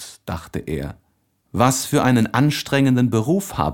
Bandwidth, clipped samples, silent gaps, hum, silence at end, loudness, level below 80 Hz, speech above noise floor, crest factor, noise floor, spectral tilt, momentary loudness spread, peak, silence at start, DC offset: 17.5 kHz; under 0.1%; none; none; 0 s; -19 LUFS; -44 dBFS; 47 dB; 20 dB; -65 dBFS; -5.5 dB/octave; 14 LU; 0 dBFS; 0 s; under 0.1%